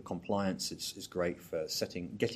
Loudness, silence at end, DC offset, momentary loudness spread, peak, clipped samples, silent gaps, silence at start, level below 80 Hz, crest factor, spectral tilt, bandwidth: -36 LUFS; 0 s; under 0.1%; 5 LU; -16 dBFS; under 0.1%; none; 0 s; -66 dBFS; 20 dB; -4 dB/octave; 15.5 kHz